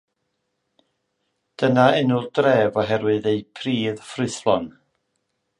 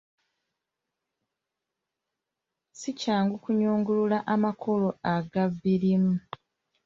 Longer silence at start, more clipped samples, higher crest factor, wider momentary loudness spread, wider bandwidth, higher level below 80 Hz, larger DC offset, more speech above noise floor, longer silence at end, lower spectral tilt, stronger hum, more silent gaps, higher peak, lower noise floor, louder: second, 1.6 s vs 2.75 s; neither; about the same, 20 dB vs 18 dB; about the same, 10 LU vs 9 LU; first, 11 kHz vs 7.6 kHz; first, -60 dBFS vs -66 dBFS; neither; second, 55 dB vs 61 dB; first, 0.9 s vs 0.65 s; about the same, -6 dB/octave vs -7 dB/octave; neither; neither; first, -2 dBFS vs -12 dBFS; second, -75 dBFS vs -86 dBFS; first, -21 LUFS vs -27 LUFS